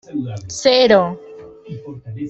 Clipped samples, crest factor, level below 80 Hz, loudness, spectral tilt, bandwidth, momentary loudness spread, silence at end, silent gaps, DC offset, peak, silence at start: under 0.1%; 18 dB; -54 dBFS; -15 LUFS; -4.5 dB/octave; 8.2 kHz; 22 LU; 0 s; none; under 0.1%; 0 dBFS; 0.1 s